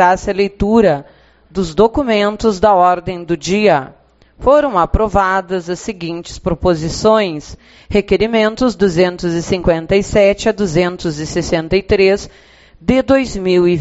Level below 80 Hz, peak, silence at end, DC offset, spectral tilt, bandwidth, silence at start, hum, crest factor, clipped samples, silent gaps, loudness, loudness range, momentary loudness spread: -32 dBFS; 0 dBFS; 0 s; under 0.1%; -5 dB/octave; 8 kHz; 0 s; none; 14 dB; under 0.1%; none; -14 LUFS; 2 LU; 10 LU